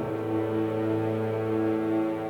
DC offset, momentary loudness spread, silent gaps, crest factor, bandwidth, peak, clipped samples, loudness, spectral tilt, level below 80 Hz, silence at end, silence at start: under 0.1%; 2 LU; none; 12 dB; 6 kHz; -16 dBFS; under 0.1%; -28 LUFS; -9 dB/octave; -62 dBFS; 0 s; 0 s